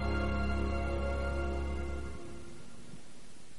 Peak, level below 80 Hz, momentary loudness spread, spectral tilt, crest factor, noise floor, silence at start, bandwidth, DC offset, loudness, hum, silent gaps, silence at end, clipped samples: -22 dBFS; -38 dBFS; 19 LU; -7 dB/octave; 16 dB; -55 dBFS; 0 s; 11.5 kHz; 0.9%; -36 LUFS; none; none; 0 s; under 0.1%